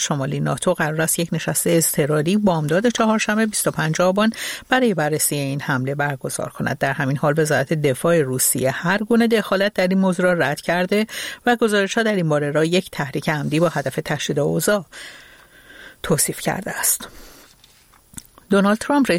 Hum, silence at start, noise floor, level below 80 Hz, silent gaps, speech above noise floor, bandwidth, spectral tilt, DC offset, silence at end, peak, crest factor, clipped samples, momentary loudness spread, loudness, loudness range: none; 0 s; -52 dBFS; -52 dBFS; none; 33 dB; 16.5 kHz; -4.5 dB/octave; under 0.1%; 0 s; -2 dBFS; 18 dB; under 0.1%; 7 LU; -19 LUFS; 5 LU